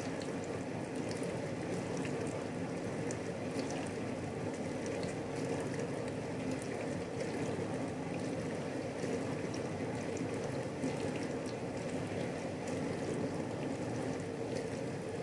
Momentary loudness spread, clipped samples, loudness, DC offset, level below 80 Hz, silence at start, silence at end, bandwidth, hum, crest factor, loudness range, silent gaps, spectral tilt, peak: 2 LU; under 0.1%; -39 LUFS; under 0.1%; -66 dBFS; 0 s; 0 s; 11.5 kHz; none; 14 dB; 1 LU; none; -6 dB/octave; -24 dBFS